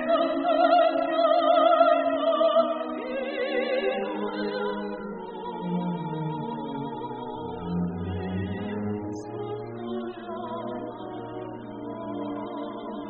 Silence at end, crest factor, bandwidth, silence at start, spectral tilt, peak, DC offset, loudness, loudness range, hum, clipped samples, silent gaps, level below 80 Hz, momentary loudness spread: 0 s; 20 dB; 4.6 kHz; 0 s; -4.5 dB/octave; -8 dBFS; under 0.1%; -27 LUFS; 12 LU; none; under 0.1%; none; -60 dBFS; 15 LU